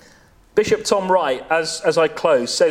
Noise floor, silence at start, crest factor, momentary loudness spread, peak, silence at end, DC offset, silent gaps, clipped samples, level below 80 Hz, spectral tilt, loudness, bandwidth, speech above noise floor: -50 dBFS; 0.55 s; 16 dB; 4 LU; -2 dBFS; 0 s; under 0.1%; none; under 0.1%; -54 dBFS; -3 dB/octave; -18 LUFS; 15.5 kHz; 32 dB